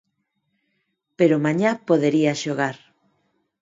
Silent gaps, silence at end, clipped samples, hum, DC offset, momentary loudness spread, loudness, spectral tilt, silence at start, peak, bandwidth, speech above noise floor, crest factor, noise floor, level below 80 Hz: none; 0.85 s; under 0.1%; none; under 0.1%; 7 LU; -21 LUFS; -6 dB/octave; 1.2 s; -4 dBFS; 7.8 kHz; 54 dB; 18 dB; -74 dBFS; -70 dBFS